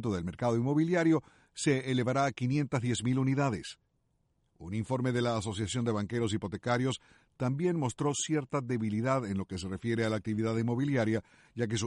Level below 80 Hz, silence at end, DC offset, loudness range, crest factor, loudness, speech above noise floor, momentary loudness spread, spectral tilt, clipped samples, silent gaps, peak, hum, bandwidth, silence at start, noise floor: -62 dBFS; 0 s; under 0.1%; 3 LU; 16 dB; -32 LUFS; 44 dB; 7 LU; -6 dB/octave; under 0.1%; none; -16 dBFS; none; 11.5 kHz; 0 s; -75 dBFS